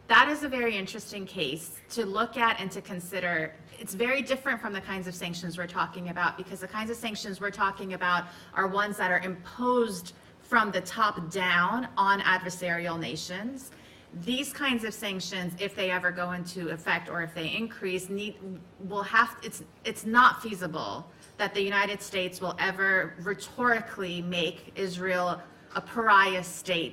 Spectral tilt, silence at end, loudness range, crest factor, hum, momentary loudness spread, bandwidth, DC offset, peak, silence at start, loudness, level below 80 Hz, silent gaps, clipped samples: -3.5 dB/octave; 0 s; 5 LU; 24 dB; none; 13 LU; 16 kHz; under 0.1%; -6 dBFS; 0.1 s; -29 LUFS; -64 dBFS; none; under 0.1%